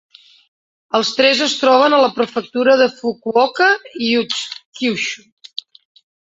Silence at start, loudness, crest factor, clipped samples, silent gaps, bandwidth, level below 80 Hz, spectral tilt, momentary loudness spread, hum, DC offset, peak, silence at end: 0.95 s; -15 LUFS; 16 dB; under 0.1%; 4.65-4.72 s; 8 kHz; -66 dBFS; -2.5 dB/octave; 16 LU; none; under 0.1%; 0 dBFS; 1.05 s